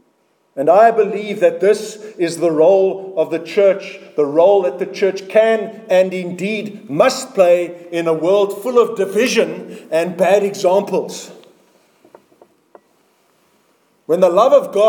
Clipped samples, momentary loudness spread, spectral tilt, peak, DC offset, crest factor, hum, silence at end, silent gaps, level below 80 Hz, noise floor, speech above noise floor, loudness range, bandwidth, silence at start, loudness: under 0.1%; 10 LU; -5 dB/octave; 0 dBFS; under 0.1%; 16 dB; none; 0 s; none; -72 dBFS; -60 dBFS; 46 dB; 5 LU; 19 kHz; 0.55 s; -15 LUFS